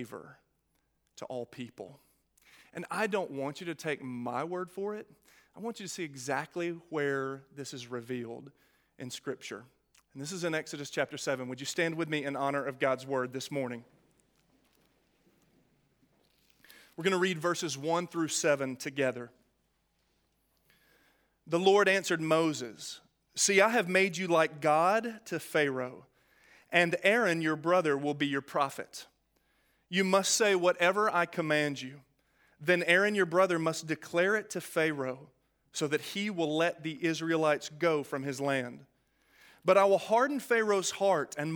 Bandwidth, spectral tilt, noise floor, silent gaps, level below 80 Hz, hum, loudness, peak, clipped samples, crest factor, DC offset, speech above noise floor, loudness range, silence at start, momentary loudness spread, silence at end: 19.5 kHz; -4 dB/octave; -76 dBFS; none; -80 dBFS; none; -30 LUFS; -8 dBFS; under 0.1%; 24 dB; under 0.1%; 46 dB; 10 LU; 0 s; 17 LU; 0 s